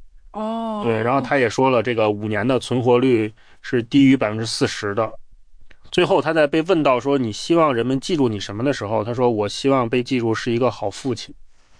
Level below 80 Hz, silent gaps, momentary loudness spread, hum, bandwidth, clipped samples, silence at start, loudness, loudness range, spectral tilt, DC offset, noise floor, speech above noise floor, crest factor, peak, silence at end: -50 dBFS; none; 9 LU; none; 10.5 kHz; under 0.1%; 0 s; -20 LUFS; 2 LU; -6 dB/octave; under 0.1%; -41 dBFS; 22 dB; 14 dB; -4 dBFS; 0.35 s